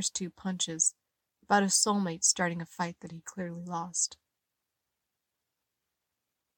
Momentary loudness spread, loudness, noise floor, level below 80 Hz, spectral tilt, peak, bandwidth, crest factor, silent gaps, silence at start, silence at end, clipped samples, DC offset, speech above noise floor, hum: 14 LU; -29 LUFS; -86 dBFS; -72 dBFS; -2.5 dB/octave; -10 dBFS; 17 kHz; 24 dB; none; 0 s; 2.45 s; under 0.1%; under 0.1%; 55 dB; none